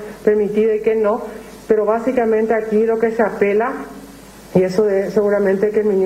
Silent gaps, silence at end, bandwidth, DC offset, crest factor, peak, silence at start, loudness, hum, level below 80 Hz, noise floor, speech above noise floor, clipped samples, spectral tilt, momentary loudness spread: none; 0 s; 14 kHz; under 0.1%; 16 dB; -2 dBFS; 0 s; -17 LUFS; none; -50 dBFS; -38 dBFS; 23 dB; under 0.1%; -7.5 dB/octave; 8 LU